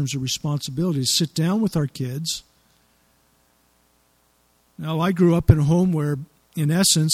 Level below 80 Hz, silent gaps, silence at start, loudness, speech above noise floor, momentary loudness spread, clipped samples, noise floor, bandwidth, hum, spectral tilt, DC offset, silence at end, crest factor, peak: -42 dBFS; none; 0 s; -21 LUFS; 42 dB; 11 LU; under 0.1%; -62 dBFS; 16 kHz; none; -5 dB/octave; under 0.1%; 0 s; 22 dB; 0 dBFS